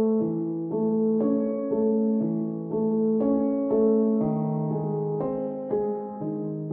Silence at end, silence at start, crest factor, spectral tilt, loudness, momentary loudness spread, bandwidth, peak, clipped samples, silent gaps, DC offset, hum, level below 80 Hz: 0 s; 0 s; 14 dB; -14.5 dB/octave; -26 LUFS; 7 LU; 2.4 kHz; -12 dBFS; under 0.1%; none; under 0.1%; none; -62 dBFS